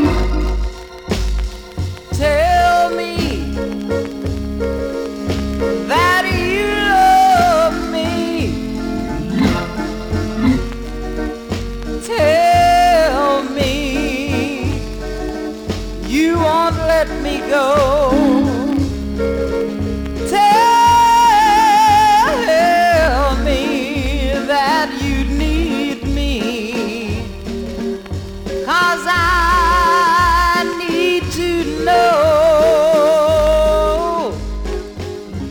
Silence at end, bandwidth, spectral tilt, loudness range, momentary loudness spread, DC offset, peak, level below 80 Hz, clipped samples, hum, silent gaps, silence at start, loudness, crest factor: 0 s; over 20 kHz; -5 dB/octave; 8 LU; 14 LU; under 0.1%; -2 dBFS; -26 dBFS; under 0.1%; none; none; 0 s; -15 LUFS; 14 dB